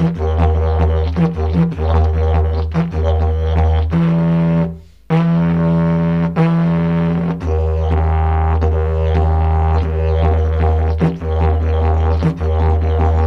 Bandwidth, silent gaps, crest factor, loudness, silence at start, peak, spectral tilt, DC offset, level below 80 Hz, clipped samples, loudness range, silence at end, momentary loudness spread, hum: 4.7 kHz; none; 12 dB; -16 LUFS; 0 s; -2 dBFS; -10 dB/octave; 0.4%; -18 dBFS; under 0.1%; 1 LU; 0 s; 3 LU; none